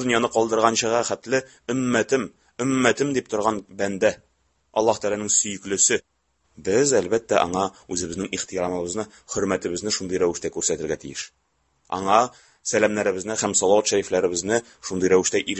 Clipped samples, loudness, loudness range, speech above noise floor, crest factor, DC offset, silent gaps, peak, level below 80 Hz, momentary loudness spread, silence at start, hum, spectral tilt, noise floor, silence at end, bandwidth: under 0.1%; -23 LUFS; 4 LU; 44 dB; 22 dB; under 0.1%; none; 0 dBFS; -54 dBFS; 10 LU; 0 s; none; -3 dB/octave; -67 dBFS; 0 s; 8.6 kHz